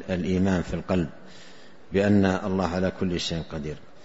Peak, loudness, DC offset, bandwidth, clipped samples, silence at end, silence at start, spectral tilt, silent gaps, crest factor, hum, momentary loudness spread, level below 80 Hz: -6 dBFS; -26 LUFS; 0.7%; 8 kHz; under 0.1%; 0.25 s; 0 s; -6.5 dB/octave; none; 18 dB; none; 12 LU; -50 dBFS